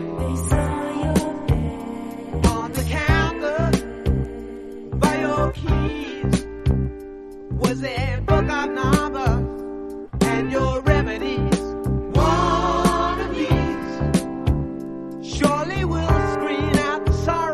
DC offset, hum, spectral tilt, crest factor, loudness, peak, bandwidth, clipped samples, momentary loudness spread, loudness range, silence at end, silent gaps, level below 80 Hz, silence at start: under 0.1%; none; -6 dB/octave; 18 dB; -22 LUFS; -4 dBFS; 13 kHz; under 0.1%; 11 LU; 3 LU; 0 s; none; -28 dBFS; 0 s